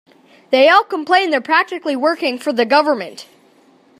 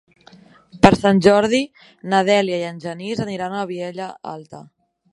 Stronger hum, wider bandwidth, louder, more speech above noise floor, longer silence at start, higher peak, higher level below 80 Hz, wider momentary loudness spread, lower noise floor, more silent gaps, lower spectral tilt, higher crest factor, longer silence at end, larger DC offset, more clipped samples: neither; first, 14 kHz vs 11.5 kHz; first, -15 LUFS vs -18 LUFS; first, 36 dB vs 29 dB; second, 0.5 s vs 0.75 s; about the same, 0 dBFS vs 0 dBFS; second, -74 dBFS vs -50 dBFS; second, 9 LU vs 18 LU; about the same, -51 dBFS vs -48 dBFS; neither; second, -3.5 dB/octave vs -6 dB/octave; about the same, 16 dB vs 20 dB; first, 0.75 s vs 0.5 s; neither; neither